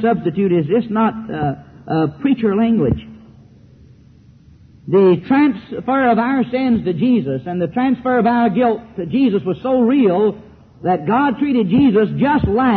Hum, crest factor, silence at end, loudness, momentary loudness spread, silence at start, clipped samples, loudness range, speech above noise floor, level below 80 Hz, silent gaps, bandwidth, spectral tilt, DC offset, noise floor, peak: none; 12 dB; 0 s; -16 LUFS; 9 LU; 0 s; under 0.1%; 4 LU; 30 dB; -42 dBFS; none; 4.6 kHz; -10.5 dB/octave; under 0.1%; -46 dBFS; -4 dBFS